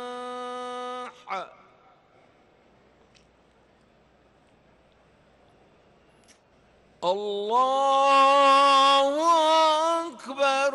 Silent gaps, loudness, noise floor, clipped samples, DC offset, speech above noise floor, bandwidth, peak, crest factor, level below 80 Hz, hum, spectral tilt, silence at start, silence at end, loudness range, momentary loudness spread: none; -22 LUFS; -60 dBFS; under 0.1%; under 0.1%; 40 dB; 12 kHz; -12 dBFS; 14 dB; -72 dBFS; none; -1.5 dB/octave; 0 s; 0 s; 21 LU; 18 LU